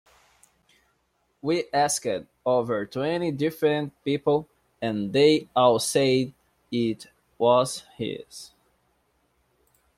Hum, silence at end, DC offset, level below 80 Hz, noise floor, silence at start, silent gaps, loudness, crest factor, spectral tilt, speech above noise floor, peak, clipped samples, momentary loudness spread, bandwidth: none; 1.5 s; under 0.1%; -66 dBFS; -71 dBFS; 1.45 s; none; -25 LUFS; 20 dB; -4.5 dB/octave; 47 dB; -6 dBFS; under 0.1%; 13 LU; 16 kHz